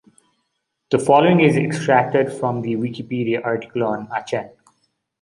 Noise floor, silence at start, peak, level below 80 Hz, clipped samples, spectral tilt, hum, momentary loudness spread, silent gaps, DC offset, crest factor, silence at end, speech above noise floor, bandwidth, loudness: -74 dBFS; 0.9 s; -2 dBFS; -62 dBFS; under 0.1%; -6.5 dB/octave; none; 11 LU; none; under 0.1%; 18 dB; 0.75 s; 56 dB; 11.5 kHz; -19 LUFS